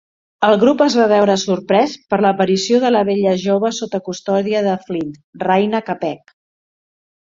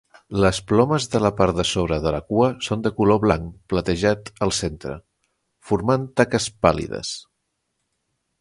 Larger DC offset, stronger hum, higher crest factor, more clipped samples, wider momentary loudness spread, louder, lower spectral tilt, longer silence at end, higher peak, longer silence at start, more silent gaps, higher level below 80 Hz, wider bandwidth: neither; neither; second, 14 dB vs 22 dB; neither; about the same, 11 LU vs 10 LU; first, -16 LUFS vs -21 LUFS; about the same, -5 dB/octave vs -5.5 dB/octave; about the same, 1.1 s vs 1.2 s; about the same, -2 dBFS vs 0 dBFS; about the same, 0.4 s vs 0.3 s; first, 5.24-5.33 s vs none; second, -60 dBFS vs -40 dBFS; second, 7.6 kHz vs 11.5 kHz